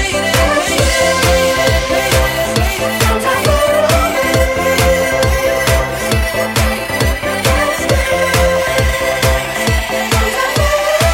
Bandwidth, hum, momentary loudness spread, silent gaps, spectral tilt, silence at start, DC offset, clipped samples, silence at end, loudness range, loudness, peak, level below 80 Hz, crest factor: 17 kHz; none; 3 LU; none; -4 dB/octave; 0 s; under 0.1%; under 0.1%; 0 s; 1 LU; -13 LUFS; 0 dBFS; -22 dBFS; 12 dB